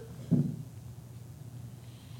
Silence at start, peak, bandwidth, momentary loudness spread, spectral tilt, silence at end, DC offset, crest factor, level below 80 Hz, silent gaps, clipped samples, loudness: 0 s; -16 dBFS; 17 kHz; 18 LU; -8.5 dB/octave; 0 s; under 0.1%; 22 dB; -60 dBFS; none; under 0.1%; -34 LUFS